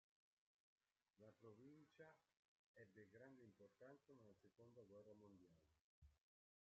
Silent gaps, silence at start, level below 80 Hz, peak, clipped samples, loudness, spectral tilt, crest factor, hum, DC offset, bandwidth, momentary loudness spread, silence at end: 2.39-2.74 s, 5.81-6.02 s; 1.15 s; under -90 dBFS; -54 dBFS; under 0.1%; -68 LUFS; -6.5 dB/octave; 18 dB; none; under 0.1%; 6.8 kHz; 2 LU; 0.5 s